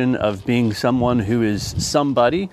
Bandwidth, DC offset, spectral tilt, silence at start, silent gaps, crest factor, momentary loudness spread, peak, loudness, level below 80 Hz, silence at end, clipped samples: 14.5 kHz; under 0.1%; -5.5 dB/octave; 0 s; none; 16 dB; 4 LU; -2 dBFS; -19 LUFS; -42 dBFS; 0.05 s; under 0.1%